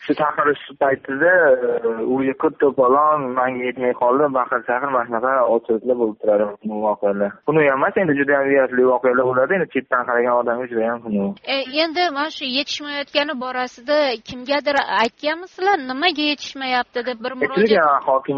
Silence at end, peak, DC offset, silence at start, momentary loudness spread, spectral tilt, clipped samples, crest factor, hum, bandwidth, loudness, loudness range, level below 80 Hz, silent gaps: 0 s; -2 dBFS; under 0.1%; 0 s; 7 LU; -2 dB/octave; under 0.1%; 16 dB; none; 7 kHz; -19 LUFS; 3 LU; -62 dBFS; none